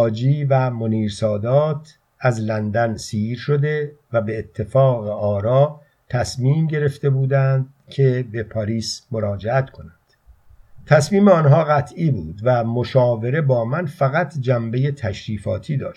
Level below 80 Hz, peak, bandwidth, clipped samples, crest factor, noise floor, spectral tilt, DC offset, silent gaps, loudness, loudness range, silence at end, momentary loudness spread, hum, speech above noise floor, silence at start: -52 dBFS; 0 dBFS; 11.5 kHz; under 0.1%; 18 dB; -52 dBFS; -7.5 dB/octave; under 0.1%; none; -19 LUFS; 4 LU; 0.05 s; 9 LU; none; 33 dB; 0 s